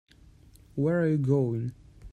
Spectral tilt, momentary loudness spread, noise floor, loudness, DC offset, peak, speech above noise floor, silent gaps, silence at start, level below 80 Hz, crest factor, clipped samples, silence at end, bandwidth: -10 dB/octave; 12 LU; -55 dBFS; -27 LUFS; under 0.1%; -12 dBFS; 29 dB; none; 0.75 s; -56 dBFS; 16 dB; under 0.1%; 0.05 s; 9.8 kHz